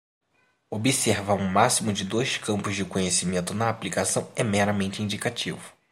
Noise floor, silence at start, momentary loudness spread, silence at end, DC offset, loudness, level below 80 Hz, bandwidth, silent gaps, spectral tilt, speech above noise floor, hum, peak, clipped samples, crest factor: -67 dBFS; 0.7 s; 7 LU; 0.2 s; under 0.1%; -25 LUFS; -62 dBFS; 16 kHz; none; -4 dB/octave; 41 dB; none; -4 dBFS; under 0.1%; 22 dB